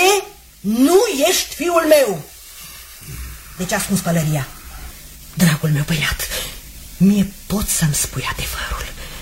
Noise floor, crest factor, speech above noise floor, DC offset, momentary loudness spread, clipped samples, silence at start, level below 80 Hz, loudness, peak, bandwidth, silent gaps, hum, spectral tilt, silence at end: -37 dBFS; 18 dB; 20 dB; under 0.1%; 21 LU; under 0.1%; 0 s; -36 dBFS; -17 LUFS; 0 dBFS; 16.5 kHz; none; none; -4.5 dB/octave; 0 s